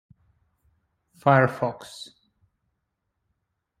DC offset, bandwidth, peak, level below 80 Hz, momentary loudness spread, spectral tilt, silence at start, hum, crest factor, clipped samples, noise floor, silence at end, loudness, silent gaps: under 0.1%; 14.5 kHz; -4 dBFS; -66 dBFS; 22 LU; -7 dB/octave; 1.25 s; none; 24 dB; under 0.1%; -79 dBFS; 1.75 s; -22 LUFS; none